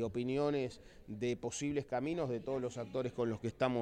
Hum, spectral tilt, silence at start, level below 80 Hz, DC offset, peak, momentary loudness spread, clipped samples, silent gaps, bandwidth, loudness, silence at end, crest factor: none; -6 dB/octave; 0 s; -64 dBFS; under 0.1%; -20 dBFS; 5 LU; under 0.1%; none; 10.5 kHz; -38 LUFS; 0 s; 16 dB